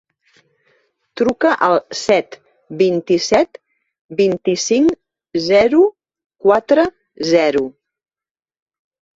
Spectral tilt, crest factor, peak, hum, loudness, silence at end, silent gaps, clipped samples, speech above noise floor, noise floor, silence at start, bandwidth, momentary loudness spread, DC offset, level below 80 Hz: -4.5 dB/octave; 16 dB; -2 dBFS; none; -16 LUFS; 1.45 s; 4.01-4.09 s, 6.26-6.30 s; under 0.1%; over 76 dB; under -90 dBFS; 1.15 s; 8 kHz; 12 LU; under 0.1%; -56 dBFS